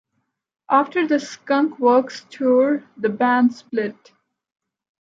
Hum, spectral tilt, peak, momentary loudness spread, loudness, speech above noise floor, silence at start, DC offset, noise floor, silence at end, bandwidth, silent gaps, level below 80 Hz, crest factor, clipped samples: none; -5.5 dB/octave; -4 dBFS; 9 LU; -20 LUFS; 55 dB; 0.7 s; under 0.1%; -74 dBFS; 1.1 s; 7.6 kHz; none; -76 dBFS; 16 dB; under 0.1%